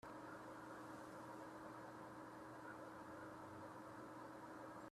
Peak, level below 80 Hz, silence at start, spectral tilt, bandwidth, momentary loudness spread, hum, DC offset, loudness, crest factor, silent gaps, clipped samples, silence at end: -42 dBFS; -82 dBFS; 0.05 s; -5.5 dB/octave; 14 kHz; 1 LU; none; under 0.1%; -56 LUFS; 14 dB; none; under 0.1%; 0 s